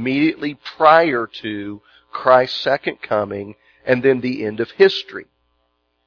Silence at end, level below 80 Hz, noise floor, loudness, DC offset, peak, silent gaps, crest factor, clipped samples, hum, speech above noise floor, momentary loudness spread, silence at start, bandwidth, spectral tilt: 0.85 s; -62 dBFS; -67 dBFS; -17 LUFS; under 0.1%; 0 dBFS; none; 18 dB; under 0.1%; none; 50 dB; 19 LU; 0 s; 5.4 kHz; -6.5 dB/octave